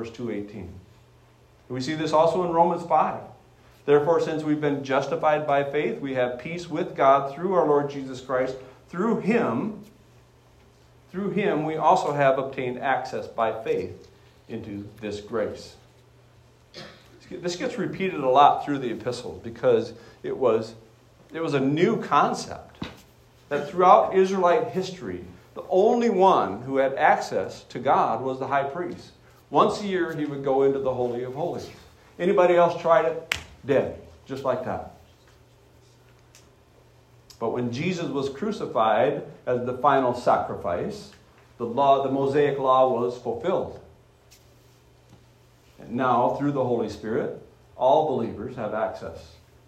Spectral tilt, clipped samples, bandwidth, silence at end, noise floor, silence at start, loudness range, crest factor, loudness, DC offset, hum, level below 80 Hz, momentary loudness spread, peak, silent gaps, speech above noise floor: -6 dB/octave; under 0.1%; 13.5 kHz; 0.4 s; -56 dBFS; 0 s; 9 LU; 24 dB; -24 LUFS; under 0.1%; none; -62 dBFS; 17 LU; -2 dBFS; none; 32 dB